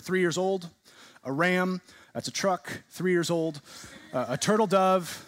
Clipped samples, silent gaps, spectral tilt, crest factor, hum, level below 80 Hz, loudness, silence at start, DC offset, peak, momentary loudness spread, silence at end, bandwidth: under 0.1%; none; -4.5 dB/octave; 18 dB; none; -72 dBFS; -27 LUFS; 0.05 s; under 0.1%; -10 dBFS; 18 LU; 0 s; 16 kHz